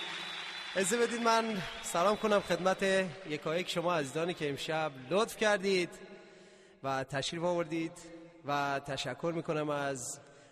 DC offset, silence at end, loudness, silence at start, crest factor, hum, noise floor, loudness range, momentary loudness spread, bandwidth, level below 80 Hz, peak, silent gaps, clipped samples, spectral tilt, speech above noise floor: under 0.1%; 0.1 s; -33 LUFS; 0 s; 18 dB; none; -58 dBFS; 5 LU; 10 LU; 13 kHz; -66 dBFS; -16 dBFS; none; under 0.1%; -4 dB/octave; 25 dB